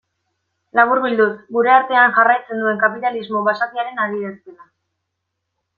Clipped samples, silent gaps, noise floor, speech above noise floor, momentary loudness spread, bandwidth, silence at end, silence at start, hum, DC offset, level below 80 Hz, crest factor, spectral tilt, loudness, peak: under 0.1%; none; -76 dBFS; 60 dB; 10 LU; 5 kHz; 1.25 s; 0.75 s; none; under 0.1%; -70 dBFS; 16 dB; -7 dB/octave; -16 LUFS; -2 dBFS